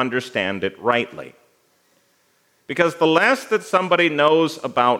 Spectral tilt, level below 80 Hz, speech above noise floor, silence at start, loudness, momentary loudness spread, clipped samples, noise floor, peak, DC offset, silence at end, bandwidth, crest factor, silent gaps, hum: -4.5 dB/octave; -74 dBFS; 43 dB; 0 s; -19 LUFS; 8 LU; under 0.1%; -62 dBFS; -2 dBFS; under 0.1%; 0 s; 16 kHz; 20 dB; none; none